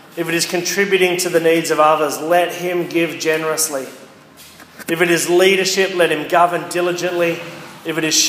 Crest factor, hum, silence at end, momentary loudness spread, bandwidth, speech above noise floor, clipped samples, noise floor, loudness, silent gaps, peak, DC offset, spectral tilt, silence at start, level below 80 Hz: 16 dB; none; 0 s; 10 LU; 15.5 kHz; 26 dB; under 0.1%; -42 dBFS; -16 LUFS; none; 0 dBFS; under 0.1%; -3 dB/octave; 0.15 s; -70 dBFS